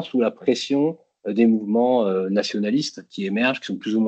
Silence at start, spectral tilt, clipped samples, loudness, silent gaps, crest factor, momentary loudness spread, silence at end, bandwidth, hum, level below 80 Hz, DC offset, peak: 0 s; -5.5 dB/octave; under 0.1%; -22 LUFS; none; 16 dB; 9 LU; 0 s; 8.4 kHz; none; -72 dBFS; under 0.1%; -6 dBFS